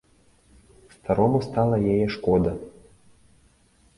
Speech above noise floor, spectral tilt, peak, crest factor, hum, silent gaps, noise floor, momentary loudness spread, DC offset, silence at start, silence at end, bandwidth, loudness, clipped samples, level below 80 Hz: 38 dB; -8.5 dB/octave; -6 dBFS; 20 dB; none; none; -60 dBFS; 16 LU; under 0.1%; 1.05 s; 1.3 s; 11.5 kHz; -23 LUFS; under 0.1%; -46 dBFS